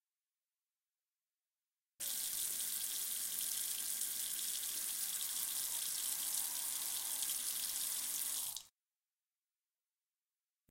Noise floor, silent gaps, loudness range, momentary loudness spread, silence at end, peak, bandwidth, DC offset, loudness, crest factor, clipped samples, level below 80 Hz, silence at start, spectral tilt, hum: under -90 dBFS; none; 4 LU; 1 LU; 2.05 s; -20 dBFS; 16.5 kHz; under 0.1%; -38 LUFS; 24 dB; under 0.1%; -80 dBFS; 2 s; 3 dB/octave; none